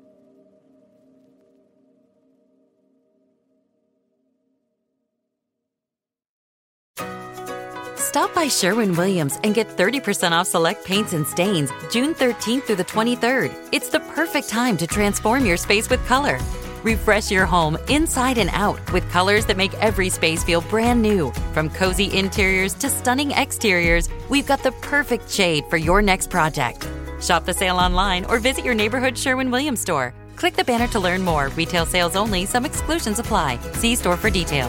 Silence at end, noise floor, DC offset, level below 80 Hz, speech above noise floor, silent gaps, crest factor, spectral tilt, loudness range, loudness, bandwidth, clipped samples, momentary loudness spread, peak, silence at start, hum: 0 s; -89 dBFS; under 0.1%; -34 dBFS; 69 dB; none; 18 dB; -4 dB/octave; 2 LU; -20 LUFS; 17 kHz; under 0.1%; 6 LU; -2 dBFS; 6.95 s; none